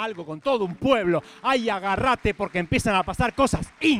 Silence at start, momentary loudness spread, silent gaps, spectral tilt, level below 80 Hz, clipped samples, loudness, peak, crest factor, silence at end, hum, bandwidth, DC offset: 0 s; 4 LU; none; -5 dB/octave; -42 dBFS; under 0.1%; -24 LUFS; -6 dBFS; 18 dB; 0 s; none; 15.5 kHz; under 0.1%